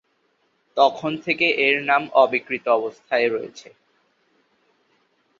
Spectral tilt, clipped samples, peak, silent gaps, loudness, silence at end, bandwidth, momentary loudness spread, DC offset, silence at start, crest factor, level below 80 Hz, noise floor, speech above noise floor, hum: -4.5 dB/octave; under 0.1%; -2 dBFS; none; -20 LUFS; 1.8 s; 7.4 kHz; 10 LU; under 0.1%; 0.75 s; 20 dB; -70 dBFS; -67 dBFS; 46 dB; none